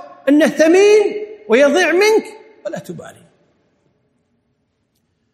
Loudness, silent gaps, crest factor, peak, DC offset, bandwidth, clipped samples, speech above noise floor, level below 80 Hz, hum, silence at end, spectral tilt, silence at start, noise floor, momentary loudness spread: -13 LUFS; none; 16 dB; 0 dBFS; under 0.1%; 14 kHz; under 0.1%; 53 dB; -66 dBFS; none; 2.25 s; -3.5 dB/octave; 0.25 s; -66 dBFS; 21 LU